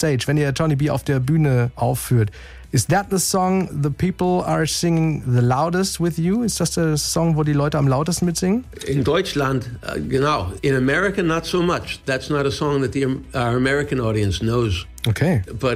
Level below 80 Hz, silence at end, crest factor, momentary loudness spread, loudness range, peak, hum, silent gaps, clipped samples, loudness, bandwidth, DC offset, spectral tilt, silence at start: -40 dBFS; 0 s; 14 dB; 5 LU; 2 LU; -6 dBFS; none; none; under 0.1%; -20 LUFS; 16 kHz; under 0.1%; -5.5 dB/octave; 0 s